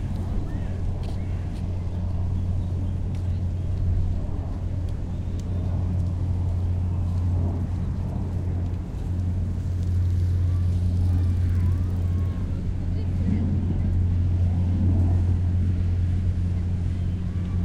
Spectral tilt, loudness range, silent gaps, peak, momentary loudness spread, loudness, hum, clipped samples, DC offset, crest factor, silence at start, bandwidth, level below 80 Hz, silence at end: -9.5 dB/octave; 4 LU; none; -12 dBFS; 7 LU; -26 LUFS; none; under 0.1%; under 0.1%; 12 dB; 0 s; 4.9 kHz; -30 dBFS; 0 s